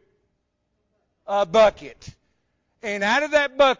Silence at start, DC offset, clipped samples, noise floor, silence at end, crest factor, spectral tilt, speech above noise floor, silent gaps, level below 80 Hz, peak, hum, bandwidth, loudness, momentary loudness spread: 1.3 s; under 0.1%; under 0.1%; -74 dBFS; 0.05 s; 16 dB; -3.5 dB/octave; 54 dB; none; -54 dBFS; -8 dBFS; none; 7.6 kHz; -20 LUFS; 19 LU